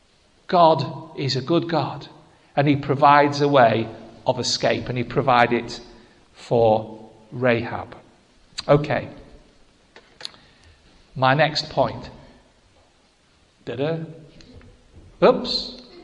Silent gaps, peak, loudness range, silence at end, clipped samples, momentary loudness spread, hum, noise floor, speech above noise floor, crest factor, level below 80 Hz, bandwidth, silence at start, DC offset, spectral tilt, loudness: none; 0 dBFS; 8 LU; 0 s; under 0.1%; 21 LU; none; -59 dBFS; 39 dB; 22 dB; -52 dBFS; 10.5 kHz; 0.5 s; under 0.1%; -5.5 dB/octave; -20 LUFS